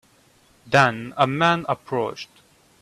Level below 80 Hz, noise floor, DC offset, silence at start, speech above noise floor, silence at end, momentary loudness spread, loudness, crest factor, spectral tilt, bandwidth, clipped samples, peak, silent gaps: -60 dBFS; -57 dBFS; under 0.1%; 0.65 s; 36 dB; 0.55 s; 13 LU; -21 LUFS; 22 dB; -5.5 dB/octave; 13.5 kHz; under 0.1%; -2 dBFS; none